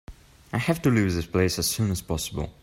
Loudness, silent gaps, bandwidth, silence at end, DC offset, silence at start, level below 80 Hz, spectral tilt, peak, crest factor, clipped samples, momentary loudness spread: -25 LUFS; none; 16.5 kHz; 0.1 s; under 0.1%; 0.1 s; -44 dBFS; -5 dB/octave; -8 dBFS; 18 dB; under 0.1%; 8 LU